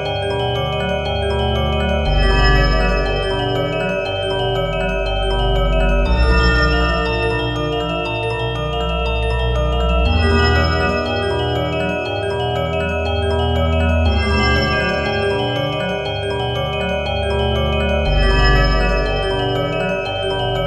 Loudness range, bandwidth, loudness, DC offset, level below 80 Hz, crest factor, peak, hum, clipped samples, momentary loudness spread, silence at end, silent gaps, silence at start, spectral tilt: 2 LU; 9.6 kHz; -18 LUFS; under 0.1%; -22 dBFS; 16 dB; 0 dBFS; none; under 0.1%; 6 LU; 0 s; none; 0 s; -6 dB/octave